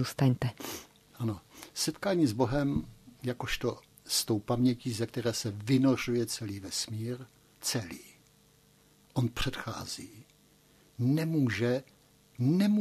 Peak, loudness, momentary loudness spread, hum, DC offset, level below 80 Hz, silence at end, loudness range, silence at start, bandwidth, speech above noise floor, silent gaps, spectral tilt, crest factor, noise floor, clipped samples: -12 dBFS; -32 LUFS; 13 LU; none; under 0.1%; -54 dBFS; 0 s; 7 LU; 0 s; 14 kHz; 33 dB; none; -5 dB/octave; 18 dB; -63 dBFS; under 0.1%